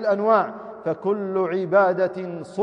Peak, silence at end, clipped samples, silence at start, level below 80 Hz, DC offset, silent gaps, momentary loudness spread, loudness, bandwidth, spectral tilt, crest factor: -6 dBFS; 0 s; under 0.1%; 0 s; -72 dBFS; under 0.1%; none; 12 LU; -22 LUFS; 9.6 kHz; -8 dB/octave; 16 dB